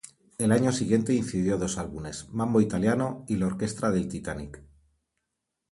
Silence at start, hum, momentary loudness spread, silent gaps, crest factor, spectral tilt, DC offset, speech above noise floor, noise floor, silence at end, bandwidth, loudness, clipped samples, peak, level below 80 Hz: 0.4 s; none; 12 LU; none; 20 dB; -6 dB/octave; under 0.1%; 57 dB; -83 dBFS; 1.1 s; 11.5 kHz; -27 LUFS; under 0.1%; -8 dBFS; -52 dBFS